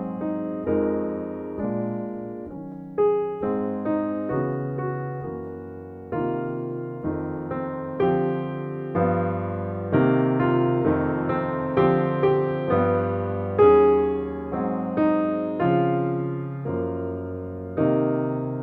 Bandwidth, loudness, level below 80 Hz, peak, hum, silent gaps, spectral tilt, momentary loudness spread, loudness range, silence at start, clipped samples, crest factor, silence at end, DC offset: 4.3 kHz; -24 LUFS; -52 dBFS; -6 dBFS; none; none; -11.5 dB/octave; 11 LU; 7 LU; 0 s; under 0.1%; 18 dB; 0 s; under 0.1%